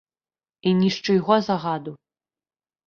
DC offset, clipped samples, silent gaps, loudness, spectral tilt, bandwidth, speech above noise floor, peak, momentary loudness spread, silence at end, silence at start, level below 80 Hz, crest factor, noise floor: under 0.1%; under 0.1%; none; -22 LUFS; -6.5 dB/octave; 6.8 kHz; over 69 dB; -4 dBFS; 10 LU; 0.9 s; 0.65 s; -64 dBFS; 20 dB; under -90 dBFS